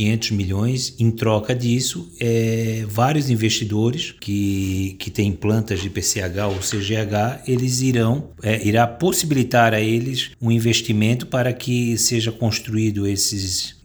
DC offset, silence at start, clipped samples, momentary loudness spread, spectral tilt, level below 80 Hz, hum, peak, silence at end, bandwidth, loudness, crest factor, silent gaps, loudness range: under 0.1%; 0 s; under 0.1%; 5 LU; -4.5 dB/octave; -48 dBFS; none; -2 dBFS; 0.15 s; over 20 kHz; -20 LUFS; 18 dB; none; 3 LU